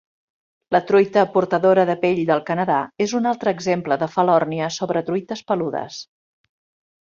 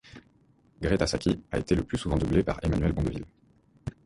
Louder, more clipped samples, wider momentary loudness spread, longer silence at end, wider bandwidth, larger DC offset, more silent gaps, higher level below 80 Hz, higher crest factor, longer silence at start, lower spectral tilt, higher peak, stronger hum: first, -20 LUFS vs -28 LUFS; neither; second, 9 LU vs 15 LU; first, 1 s vs 0.15 s; second, 7.4 kHz vs 11.5 kHz; neither; neither; second, -64 dBFS vs -38 dBFS; about the same, 18 dB vs 18 dB; first, 0.7 s vs 0.05 s; about the same, -6 dB/octave vs -6.5 dB/octave; first, -2 dBFS vs -10 dBFS; neither